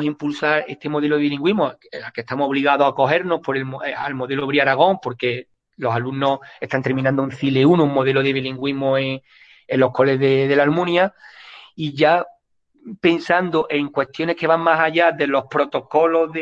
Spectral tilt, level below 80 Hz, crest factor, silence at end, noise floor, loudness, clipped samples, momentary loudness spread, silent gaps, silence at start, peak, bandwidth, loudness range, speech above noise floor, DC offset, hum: -7.5 dB/octave; -62 dBFS; 18 dB; 0 s; -60 dBFS; -19 LUFS; under 0.1%; 10 LU; none; 0 s; -2 dBFS; 7.8 kHz; 2 LU; 41 dB; under 0.1%; none